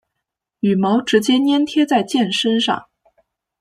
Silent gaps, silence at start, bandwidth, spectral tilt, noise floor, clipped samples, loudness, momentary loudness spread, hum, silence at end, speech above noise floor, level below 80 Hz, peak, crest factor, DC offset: none; 0.65 s; 13 kHz; -5 dB/octave; -80 dBFS; under 0.1%; -17 LUFS; 5 LU; none; 0.8 s; 63 dB; -62 dBFS; -2 dBFS; 16 dB; under 0.1%